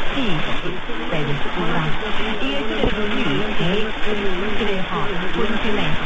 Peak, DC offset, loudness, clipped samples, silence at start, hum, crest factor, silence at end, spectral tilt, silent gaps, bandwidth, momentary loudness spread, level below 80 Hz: -6 dBFS; under 0.1%; -22 LUFS; under 0.1%; 0 s; none; 12 dB; 0 s; -6 dB/octave; none; 8 kHz; 3 LU; -32 dBFS